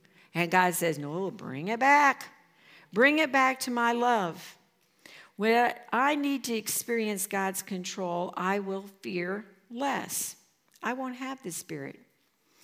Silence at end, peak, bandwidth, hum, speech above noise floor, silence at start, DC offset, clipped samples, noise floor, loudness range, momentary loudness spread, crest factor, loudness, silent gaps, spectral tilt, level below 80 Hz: 0.7 s; -8 dBFS; 16.5 kHz; none; 41 dB; 0.35 s; under 0.1%; under 0.1%; -69 dBFS; 9 LU; 15 LU; 22 dB; -28 LUFS; none; -3.5 dB/octave; -88 dBFS